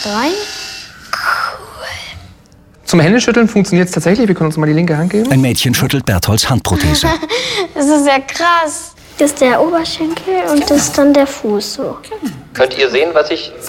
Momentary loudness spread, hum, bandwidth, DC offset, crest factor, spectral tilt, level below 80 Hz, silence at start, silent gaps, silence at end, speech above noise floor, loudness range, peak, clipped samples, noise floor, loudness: 14 LU; none; 17.5 kHz; under 0.1%; 12 dB; -4.5 dB/octave; -36 dBFS; 0 s; none; 0 s; 31 dB; 2 LU; 0 dBFS; under 0.1%; -43 dBFS; -13 LUFS